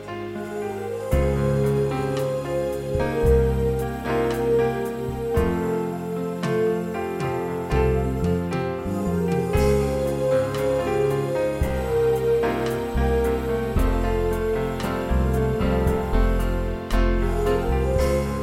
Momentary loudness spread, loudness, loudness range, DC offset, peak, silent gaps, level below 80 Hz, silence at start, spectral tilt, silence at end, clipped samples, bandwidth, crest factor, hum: 6 LU; -23 LUFS; 2 LU; under 0.1%; -6 dBFS; none; -28 dBFS; 0 s; -7 dB/octave; 0 s; under 0.1%; 16 kHz; 16 dB; none